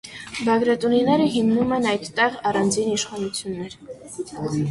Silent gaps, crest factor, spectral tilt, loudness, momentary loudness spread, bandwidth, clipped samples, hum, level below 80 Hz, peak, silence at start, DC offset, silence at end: none; 16 dB; -4.5 dB/octave; -21 LUFS; 14 LU; 11.5 kHz; under 0.1%; none; -56 dBFS; -6 dBFS; 0.05 s; under 0.1%; 0 s